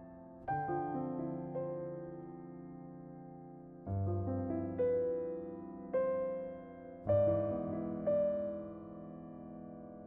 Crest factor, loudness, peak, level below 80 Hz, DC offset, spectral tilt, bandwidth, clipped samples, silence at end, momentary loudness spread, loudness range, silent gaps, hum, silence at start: 18 dB; -37 LUFS; -22 dBFS; -64 dBFS; under 0.1%; -10 dB/octave; 3.7 kHz; under 0.1%; 0 s; 17 LU; 7 LU; none; none; 0 s